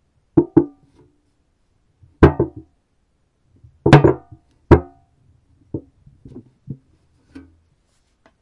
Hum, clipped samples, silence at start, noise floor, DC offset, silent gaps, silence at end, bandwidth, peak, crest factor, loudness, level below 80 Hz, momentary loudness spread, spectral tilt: none; under 0.1%; 0.35 s; -65 dBFS; under 0.1%; none; 1.7 s; 9.8 kHz; 0 dBFS; 20 dB; -16 LUFS; -36 dBFS; 25 LU; -8.5 dB/octave